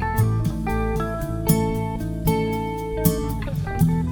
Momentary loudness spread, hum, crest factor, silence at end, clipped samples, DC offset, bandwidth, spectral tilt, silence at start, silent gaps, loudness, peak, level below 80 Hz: 6 LU; none; 18 dB; 0 s; under 0.1%; under 0.1%; over 20 kHz; -6.5 dB/octave; 0 s; none; -23 LUFS; -4 dBFS; -32 dBFS